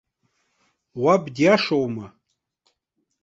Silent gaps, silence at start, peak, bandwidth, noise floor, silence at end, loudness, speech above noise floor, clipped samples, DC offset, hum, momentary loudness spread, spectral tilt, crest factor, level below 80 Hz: none; 0.95 s; -4 dBFS; 8 kHz; -75 dBFS; 1.15 s; -20 LUFS; 56 dB; under 0.1%; under 0.1%; none; 15 LU; -6 dB/octave; 20 dB; -66 dBFS